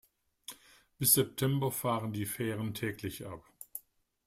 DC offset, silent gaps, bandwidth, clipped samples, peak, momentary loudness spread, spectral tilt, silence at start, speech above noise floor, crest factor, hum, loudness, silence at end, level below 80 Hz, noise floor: under 0.1%; none; 16 kHz; under 0.1%; -10 dBFS; 22 LU; -4 dB/octave; 0.5 s; 27 dB; 24 dB; none; -32 LUFS; 0.45 s; -66 dBFS; -59 dBFS